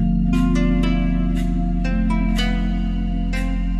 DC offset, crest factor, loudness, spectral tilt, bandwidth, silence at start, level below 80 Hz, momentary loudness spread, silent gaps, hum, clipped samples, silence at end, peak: under 0.1%; 12 dB; -21 LUFS; -7 dB/octave; 11 kHz; 0 s; -22 dBFS; 5 LU; none; none; under 0.1%; 0 s; -6 dBFS